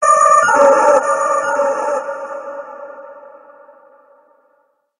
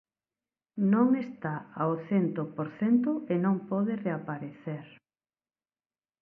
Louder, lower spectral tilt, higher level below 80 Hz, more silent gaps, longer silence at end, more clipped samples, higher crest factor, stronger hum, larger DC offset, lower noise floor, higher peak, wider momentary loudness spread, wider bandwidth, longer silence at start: first, -13 LUFS vs -30 LUFS; second, -2 dB/octave vs -11 dB/octave; first, -68 dBFS vs -76 dBFS; neither; first, 1.7 s vs 1.35 s; neither; about the same, 16 dB vs 18 dB; neither; neither; second, -61 dBFS vs under -90 dBFS; first, 0 dBFS vs -14 dBFS; first, 23 LU vs 13 LU; first, 11 kHz vs 3.3 kHz; second, 0 s vs 0.75 s